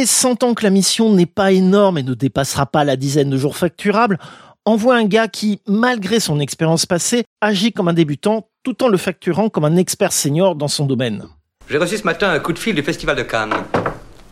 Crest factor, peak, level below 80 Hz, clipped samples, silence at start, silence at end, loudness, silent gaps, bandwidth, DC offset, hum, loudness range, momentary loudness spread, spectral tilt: 16 dB; 0 dBFS; -48 dBFS; under 0.1%; 0 s; 0.3 s; -16 LUFS; 7.27-7.36 s; 16 kHz; under 0.1%; none; 3 LU; 6 LU; -4.5 dB/octave